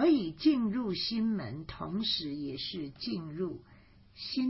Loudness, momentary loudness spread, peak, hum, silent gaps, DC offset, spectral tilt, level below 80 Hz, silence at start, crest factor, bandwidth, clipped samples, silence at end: -33 LUFS; 11 LU; -16 dBFS; none; none; under 0.1%; -8.5 dB/octave; -60 dBFS; 0 s; 18 dB; 5.8 kHz; under 0.1%; 0 s